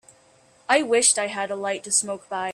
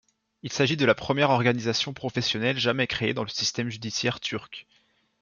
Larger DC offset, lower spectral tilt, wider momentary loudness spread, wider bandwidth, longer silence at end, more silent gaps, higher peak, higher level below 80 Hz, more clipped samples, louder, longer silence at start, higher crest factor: neither; second, -0.5 dB/octave vs -4 dB/octave; about the same, 12 LU vs 11 LU; first, 14.5 kHz vs 7.4 kHz; second, 0 s vs 0.6 s; neither; about the same, -4 dBFS vs -6 dBFS; second, -72 dBFS vs -60 dBFS; neither; first, -22 LUFS vs -25 LUFS; first, 0.7 s vs 0.45 s; about the same, 20 dB vs 20 dB